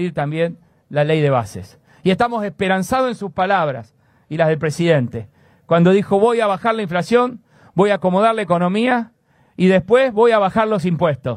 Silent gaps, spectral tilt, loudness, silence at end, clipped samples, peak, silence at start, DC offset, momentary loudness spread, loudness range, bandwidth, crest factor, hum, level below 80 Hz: none; -7 dB/octave; -17 LUFS; 0 s; under 0.1%; 0 dBFS; 0 s; under 0.1%; 9 LU; 3 LU; 13 kHz; 16 dB; none; -54 dBFS